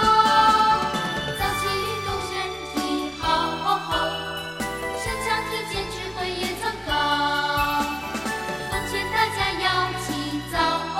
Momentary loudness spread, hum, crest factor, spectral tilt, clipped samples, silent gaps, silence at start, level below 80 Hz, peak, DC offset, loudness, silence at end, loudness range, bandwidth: 9 LU; none; 18 dB; -3.5 dB/octave; under 0.1%; none; 0 s; -42 dBFS; -6 dBFS; under 0.1%; -24 LUFS; 0 s; 3 LU; 16 kHz